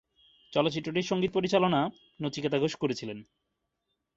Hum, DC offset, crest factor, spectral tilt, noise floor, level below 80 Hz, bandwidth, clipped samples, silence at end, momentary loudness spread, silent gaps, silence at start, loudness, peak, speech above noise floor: none; under 0.1%; 20 dB; -5.5 dB/octave; -82 dBFS; -66 dBFS; 8 kHz; under 0.1%; 0.95 s; 11 LU; none; 0.5 s; -29 LUFS; -10 dBFS; 53 dB